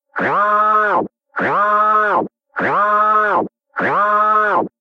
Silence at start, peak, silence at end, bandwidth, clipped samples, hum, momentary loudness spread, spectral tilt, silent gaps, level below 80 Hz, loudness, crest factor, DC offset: 0.15 s; -4 dBFS; 0.15 s; 6.6 kHz; under 0.1%; none; 8 LU; -6.5 dB/octave; none; -62 dBFS; -15 LUFS; 12 dB; under 0.1%